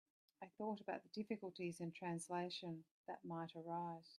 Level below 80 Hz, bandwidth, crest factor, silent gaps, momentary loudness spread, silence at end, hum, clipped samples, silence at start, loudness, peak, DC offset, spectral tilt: under -90 dBFS; 12.5 kHz; 18 dB; 2.91-3.04 s; 9 LU; 0.05 s; none; under 0.1%; 0.4 s; -49 LUFS; -32 dBFS; under 0.1%; -5.5 dB/octave